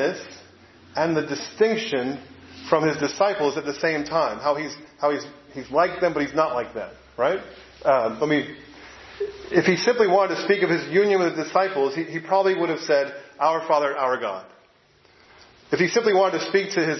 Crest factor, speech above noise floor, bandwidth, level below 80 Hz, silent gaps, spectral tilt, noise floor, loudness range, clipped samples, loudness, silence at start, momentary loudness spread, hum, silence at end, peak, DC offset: 20 dB; 35 dB; 6.2 kHz; -62 dBFS; none; -5 dB/octave; -57 dBFS; 4 LU; under 0.1%; -23 LUFS; 0 s; 14 LU; none; 0 s; -2 dBFS; under 0.1%